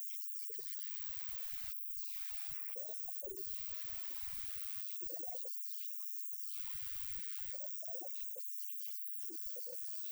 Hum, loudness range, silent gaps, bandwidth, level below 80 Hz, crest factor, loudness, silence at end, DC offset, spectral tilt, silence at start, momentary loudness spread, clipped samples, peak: none; 0 LU; none; over 20 kHz; -68 dBFS; 18 dB; -40 LUFS; 0 s; under 0.1%; -1.5 dB/octave; 0 s; 1 LU; under 0.1%; -26 dBFS